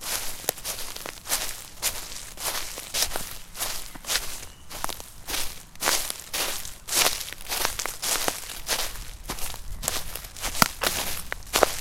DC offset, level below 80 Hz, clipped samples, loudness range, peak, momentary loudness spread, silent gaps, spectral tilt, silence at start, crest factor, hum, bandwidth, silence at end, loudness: under 0.1%; -42 dBFS; under 0.1%; 4 LU; 0 dBFS; 12 LU; none; -0.5 dB/octave; 0 s; 30 dB; none; 17 kHz; 0 s; -28 LUFS